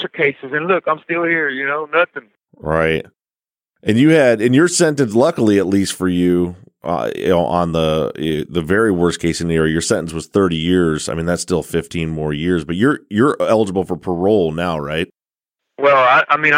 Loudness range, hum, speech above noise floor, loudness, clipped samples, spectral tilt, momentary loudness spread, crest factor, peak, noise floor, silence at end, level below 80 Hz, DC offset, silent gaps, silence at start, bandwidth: 3 LU; none; over 74 dB; -16 LUFS; under 0.1%; -5 dB/octave; 9 LU; 14 dB; -2 dBFS; under -90 dBFS; 0 s; -42 dBFS; under 0.1%; none; 0 s; 16 kHz